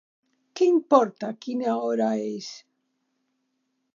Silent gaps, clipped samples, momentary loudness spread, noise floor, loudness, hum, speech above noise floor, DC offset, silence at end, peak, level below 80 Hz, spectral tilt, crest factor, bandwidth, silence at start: none; under 0.1%; 16 LU; -76 dBFS; -24 LUFS; none; 52 dB; under 0.1%; 1.4 s; -4 dBFS; -86 dBFS; -5.5 dB/octave; 22 dB; 7.4 kHz; 0.55 s